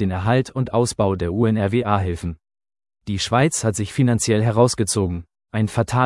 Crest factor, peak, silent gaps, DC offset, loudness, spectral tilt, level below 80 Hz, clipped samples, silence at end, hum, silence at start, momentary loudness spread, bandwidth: 18 dB; -2 dBFS; none; under 0.1%; -20 LUFS; -5.5 dB/octave; -48 dBFS; under 0.1%; 0 s; none; 0 s; 11 LU; 12 kHz